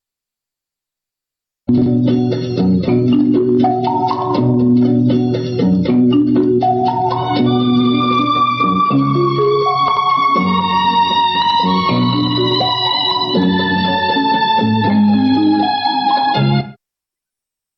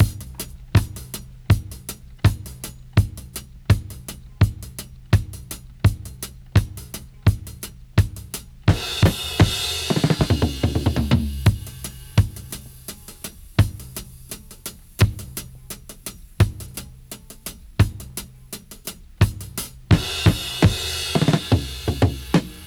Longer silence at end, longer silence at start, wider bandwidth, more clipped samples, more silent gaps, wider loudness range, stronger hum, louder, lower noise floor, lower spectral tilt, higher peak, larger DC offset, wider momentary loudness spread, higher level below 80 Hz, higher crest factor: first, 1.05 s vs 0 s; first, 1.7 s vs 0 s; second, 6.2 kHz vs over 20 kHz; neither; neither; second, 1 LU vs 6 LU; neither; first, -14 LUFS vs -22 LUFS; first, -85 dBFS vs -41 dBFS; first, -8 dB/octave vs -5.5 dB/octave; second, -6 dBFS vs -2 dBFS; neither; second, 4 LU vs 17 LU; second, -50 dBFS vs -32 dBFS; second, 8 dB vs 20 dB